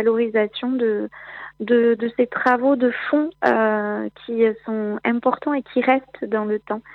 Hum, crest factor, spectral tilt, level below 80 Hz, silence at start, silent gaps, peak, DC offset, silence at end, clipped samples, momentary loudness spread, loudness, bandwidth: none; 18 dB; -7.5 dB/octave; -66 dBFS; 0 s; none; -2 dBFS; under 0.1%; 0 s; under 0.1%; 9 LU; -21 LUFS; 5.8 kHz